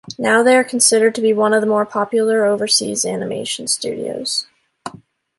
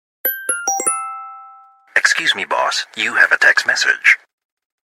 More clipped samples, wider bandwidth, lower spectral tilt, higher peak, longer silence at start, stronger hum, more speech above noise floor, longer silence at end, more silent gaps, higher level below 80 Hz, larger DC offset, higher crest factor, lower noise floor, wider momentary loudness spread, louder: neither; second, 12 kHz vs 16.5 kHz; first, -2.5 dB/octave vs 1.5 dB/octave; about the same, 0 dBFS vs 0 dBFS; second, 0.05 s vs 0.25 s; neither; about the same, 27 dB vs 29 dB; second, 0.5 s vs 0.7 s; neither; first, -64 dBFS vs -70 dBFS; neither; about the same, 18 dB vs 18 dB; about the same, -43 dBFS vs -44 dBFS; about the same, 11 LU vs 10 LU; about the same, -16 LUFS vs -15 LUFS